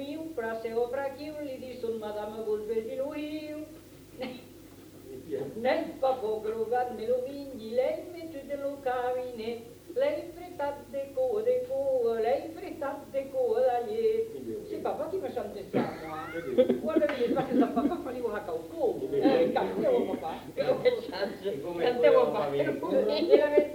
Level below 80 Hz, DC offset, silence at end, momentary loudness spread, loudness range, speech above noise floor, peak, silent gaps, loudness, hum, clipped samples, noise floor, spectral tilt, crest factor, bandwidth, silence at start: -62 dBFS; under 0.1%; 0 s; 13 LU; 8 LU; 20 dB; -8 dBFS; none; -30 LUFS; none; under 0.1%; -50 dBFS; -6 dB/octave; 22 dB; 19.5 kHz; 0 s